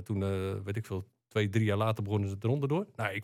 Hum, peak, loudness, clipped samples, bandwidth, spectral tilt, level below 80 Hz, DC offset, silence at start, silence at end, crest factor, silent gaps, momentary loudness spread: none; -16 dBFS; -32 LUFS; under 0.1%; 14 kHz; -7.5 dB/octave; -68 dBFS; under 0.1%; 0 s; 0 s; 16 dB; none; 8 LU